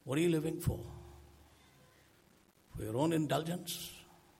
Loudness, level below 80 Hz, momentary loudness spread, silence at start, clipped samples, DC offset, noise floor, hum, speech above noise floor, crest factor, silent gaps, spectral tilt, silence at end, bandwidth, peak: -36 LUFS; -58 dBFS; 21 LU; 0.05 s; under 0.1%; under 0.1%; -67 dBFS; none; 32 dB; 18 dB; none; -5.5 dB/octave; 0.35 s; 16.5 kHz; -20 dBFS